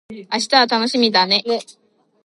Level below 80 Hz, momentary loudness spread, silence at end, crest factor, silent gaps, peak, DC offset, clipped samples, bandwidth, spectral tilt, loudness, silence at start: -70 dBFS; 10 LU; 0.55 s; 18 dB; none; 0 dBFS; under 0.1%; under 0.1%; 11.5 kHz; -2.5 dB/octave; -16 LUFS; 0.1 s